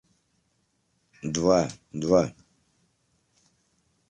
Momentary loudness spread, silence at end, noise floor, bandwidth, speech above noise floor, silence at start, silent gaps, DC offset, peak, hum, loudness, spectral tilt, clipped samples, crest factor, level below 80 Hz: 10 LU; 1.8 s; -72 dBFS; 11 kHz; 48 dB; 1.25 s; none; under 0.1%; -8 dBFS; none; -25 LUFS; -5.5 dB/octave; under 0.1%; 22 dB; -56 dBFS